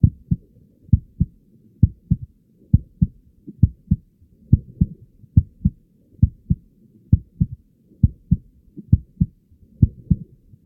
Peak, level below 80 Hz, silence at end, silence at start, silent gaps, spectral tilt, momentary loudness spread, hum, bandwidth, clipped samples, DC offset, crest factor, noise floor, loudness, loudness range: 0 dBFS; -30 dBFS; 0.45 s; 0.05 s; none; -15.5 dB/octave; 7 LU; none; 0.8 kHz; under 0.1%; under 0.1%; 22 dB; -53 dBFS; -23 LUFS; 1 LU